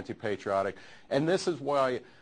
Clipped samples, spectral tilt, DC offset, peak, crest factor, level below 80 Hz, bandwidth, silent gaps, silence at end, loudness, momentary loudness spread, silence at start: under 0.1%; -5.5 dB/octave; under 0.1%; -12 dBFS; 18 dB; -68 dBFS; 10 kHz; none; 0.2 s; -30 LUFS; 7 LU; 0 s